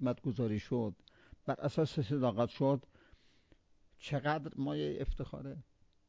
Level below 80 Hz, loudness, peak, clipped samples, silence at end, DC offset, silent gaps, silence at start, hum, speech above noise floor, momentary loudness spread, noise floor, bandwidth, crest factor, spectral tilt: -52 dBFS; -36 LUFS; -20 dBFS; under 0.1%; 0.45 s; under 0.1%; none; 0 s; none; 32 dB; 13 LU; -67 dBFS; 7.8 kHz; 18 dB; -8 dB/octave